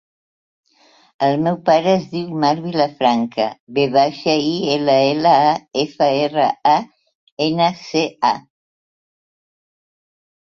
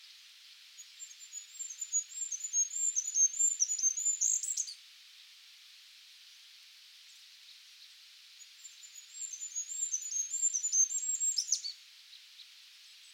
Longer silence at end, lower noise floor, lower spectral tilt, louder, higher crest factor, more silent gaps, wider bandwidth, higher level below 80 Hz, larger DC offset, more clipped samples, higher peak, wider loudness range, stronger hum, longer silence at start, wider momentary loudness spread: first, 2.1 s vs 0 s; about the same, -54 dBFS vs -57 dBFS; first, -5.5 dB/octave vs 11.5 dB/octave; first, -17 LUFS vs -31 LUFS; second, 16 dB vs 22 dB; first, 3.60-3.67 s, 7.15-7.37 s vs none; second, 7.4 kHz vs over 20 kHz; first, -62 dBFS vs under -90 dBFS; neither; neither; first, -2 dBFS vs -16 dBFS; second, 6 LU vs 23 LU; neither; first, 1.2 s vs 0 s; second, 6 LU vs 26 LU